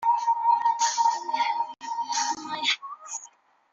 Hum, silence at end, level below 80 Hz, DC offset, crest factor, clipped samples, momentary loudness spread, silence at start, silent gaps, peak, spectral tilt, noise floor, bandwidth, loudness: none; 0.45 s; -80 dBFS; under 0.1%; 16 dB; under 0.1%; 13 LU; 0 s; none; -12 dBFS; 1.5 dB/octave; -53 dBFS; 7.8 kHz; -25 LUFS